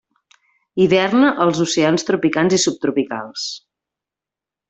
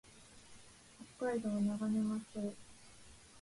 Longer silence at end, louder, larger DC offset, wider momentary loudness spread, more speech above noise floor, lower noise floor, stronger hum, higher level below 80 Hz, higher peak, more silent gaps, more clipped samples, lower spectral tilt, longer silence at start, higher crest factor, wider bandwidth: first, 1.1 s vs 0 s; first, -17 LUFS vs -38 LUFS; neither; second, 12 LU vs 23 LU; first, 71 dB vs 22 dB; first, -88 dBFS vs -59 dBFS; neither; first, -60 dBFS vs -70 dBFS; first, -2 dBFS vs -26 dBFS; neither; neither; second, -4.5 dB/octave vs -6.5 dB/octave; first, 0.75 s vs 0.05 s; about the same, 16 dB vs 14 dB; second, 8.4 kHz vs 11.5 kHz